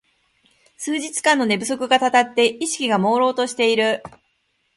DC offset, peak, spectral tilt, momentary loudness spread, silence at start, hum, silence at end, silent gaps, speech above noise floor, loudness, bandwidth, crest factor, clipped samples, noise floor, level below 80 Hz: under 0.1%; 0 dBFS; -3 dB/octave; 8 LU; 0.8 s; none; 0.7 s; none; 49 dB; -19 LUFS; 11.5 kHz; 20 dB; under 0.1%; -68 dBFS; -66 dBFS